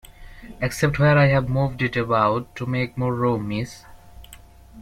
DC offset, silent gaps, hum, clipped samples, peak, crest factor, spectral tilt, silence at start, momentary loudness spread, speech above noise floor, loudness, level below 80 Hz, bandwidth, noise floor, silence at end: under 0.1%; none; none; under 0.1%; -6 dBFS; 18 dB; -7 dB/octave; 0.05 s; 11 LU; 25 dB; -21 LUFS; -44 dBFS; 14.5 kHz; -46 dBFS; 0 s